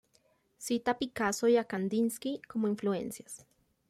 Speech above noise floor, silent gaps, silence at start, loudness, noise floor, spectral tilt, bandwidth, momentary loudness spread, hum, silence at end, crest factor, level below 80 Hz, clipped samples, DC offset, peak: 39 dB; none; 0.6 s; -32 LUFS; -71 dBFS; -4.5 dB/octave; 15.5 kHz; 16 LU; none; 0.55 s; 16 dB; -70 dBFS; under 0.1%; under 0.1%; -16 dBFS